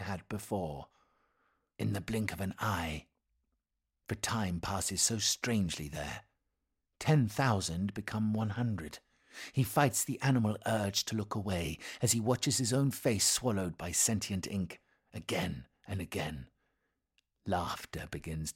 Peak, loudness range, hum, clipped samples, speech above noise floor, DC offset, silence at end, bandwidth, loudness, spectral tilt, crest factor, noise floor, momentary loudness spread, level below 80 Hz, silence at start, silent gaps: -12 dBFS; 8 LU; none; under 0.1%; 52 dB; under 0.1%; 0.05 s; 16.5 kHz; -33 LUFS; -4 dB/octave; 22 dB; -86 dBFS; 14 LU; -56 dBFS; 0 s; none